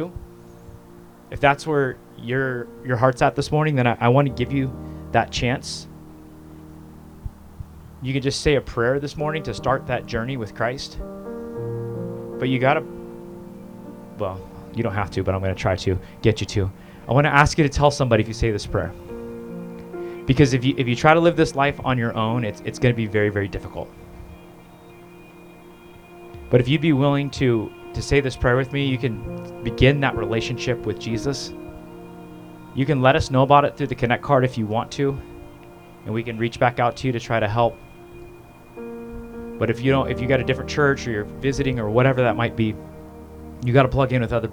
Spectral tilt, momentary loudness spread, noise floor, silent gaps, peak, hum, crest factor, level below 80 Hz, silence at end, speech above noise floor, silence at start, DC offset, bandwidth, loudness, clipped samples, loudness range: -6.5 dB/octave; 22 LU; -45 dBFS; none; 0 dBFS; none; 22 dB; -42 dBFS; 0 s; 24 dB; 0 s; under 0.1%; 13 kHz; -21 LUFS; under 0.1%; 7 LU